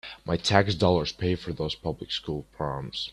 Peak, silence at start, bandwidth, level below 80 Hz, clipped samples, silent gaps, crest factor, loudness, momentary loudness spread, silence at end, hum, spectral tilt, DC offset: -2 dBFS; 0.05 s; 12 kHz; -50 dBFS; under 0.1%; none; 24 dB; -27 LUFS; 10 LU; 0 s; none; -5.5 dB/octave; under 0.1%